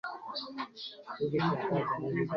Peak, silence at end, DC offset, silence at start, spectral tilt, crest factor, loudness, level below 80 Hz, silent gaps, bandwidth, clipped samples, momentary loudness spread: -16 dBFS; 0 s; under 0.1%; 0.05 s; -8 dB/octave; 18 dB; -34 LUFS; -68 dBFS; none; 6.6 kHz; under 0.1%; 11 LU